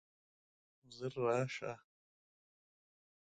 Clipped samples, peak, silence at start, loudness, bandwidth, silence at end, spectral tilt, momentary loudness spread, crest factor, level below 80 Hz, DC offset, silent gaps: under 0.1%; -22 dBFS; 0.9 s; -40 LUFS; 9 kHz; 1.55 s; -6 dB/octave; 17 LU; 22 dB; -80 dBFS; under 0.1%; none